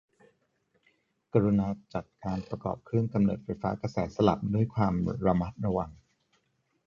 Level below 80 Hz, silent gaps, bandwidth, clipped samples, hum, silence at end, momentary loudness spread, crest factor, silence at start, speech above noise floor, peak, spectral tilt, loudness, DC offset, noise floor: -52 dBFS; none; 7.2 kHz; under 0.1%; none; 0.95 s; 10 LU; 22 dB; 1.35 s; 46 dB; -8 dBFS; -9 dB/octave; -30 LUFS; under 0.1%; -75 dBFS